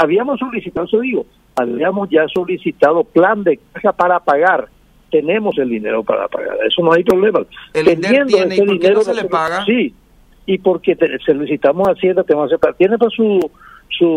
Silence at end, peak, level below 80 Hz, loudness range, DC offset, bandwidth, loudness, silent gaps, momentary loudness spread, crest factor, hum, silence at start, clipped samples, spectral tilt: 0 s; 0 dBFS; -52 dBFS; 2 LU; under 0.1%; 15 kHz; -15 LUFS; none; 8 LU; 14 dB; none; 0 s; under 0.1%; -6 dB/octave